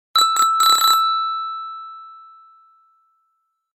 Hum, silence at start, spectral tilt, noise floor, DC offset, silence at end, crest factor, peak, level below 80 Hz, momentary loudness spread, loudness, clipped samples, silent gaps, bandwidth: none; 0.15 s; 3.5 dB/octave; -71 dBFS; under 0.1%; 1.55 s; 20 dB; -2 dBFS; -88 dBFS; 21 LU; -15 LUFS; under 0.1%; none; 16.5 kHz